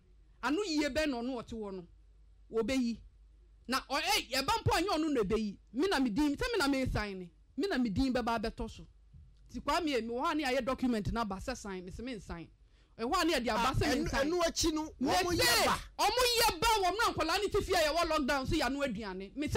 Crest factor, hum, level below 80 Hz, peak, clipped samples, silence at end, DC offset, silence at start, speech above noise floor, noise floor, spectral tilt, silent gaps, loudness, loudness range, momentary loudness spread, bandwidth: 14 dB; none; -48 dBFS; -20 dBFS; under 0.1%; 0 s; under 0.1%; 0.4 s; 27 dB; -60 dBFS; -3.5 dB/octave; none; -32 LUFS; 7 LU; 14 LU; 16 kHz